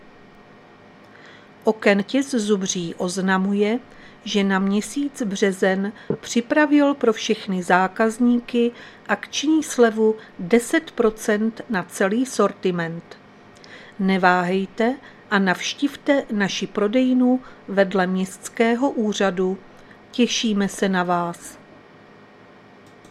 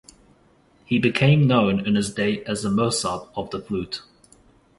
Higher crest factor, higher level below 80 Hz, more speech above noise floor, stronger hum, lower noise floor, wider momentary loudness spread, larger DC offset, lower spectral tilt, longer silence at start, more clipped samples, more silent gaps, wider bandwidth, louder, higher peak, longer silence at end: about the same, 22 dB vs 20 dB; second, -58 dBFS vs -52 dBFS; second, 27 dB vs 36 dB; neither; second, -47 dBFS vs -57 dBFS; second, 9 LU vs 14 LU; neither; about the same, -5 dB/octave vs -5.5 dB/octave; first, 1.25 s vs 0.9 s; neither; neither; first, 14 kHz vs 11.5 kHz; about the same, -21 LUFS vs -22 LUFS; first, 0 dBFS vs -4 dBFS; first, 1.55 s vs 0.8 s